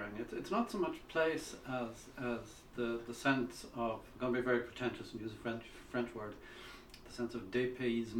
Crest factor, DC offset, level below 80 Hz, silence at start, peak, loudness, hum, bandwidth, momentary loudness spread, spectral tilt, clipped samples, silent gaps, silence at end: 22 dB; under 0.1%; -62 dBFS; 0 s; -18 dBFS; -39 LUFS; none; 17.5 kHz; 13 LU; -5.5 dB/octave; under 0.1%; none; 0 s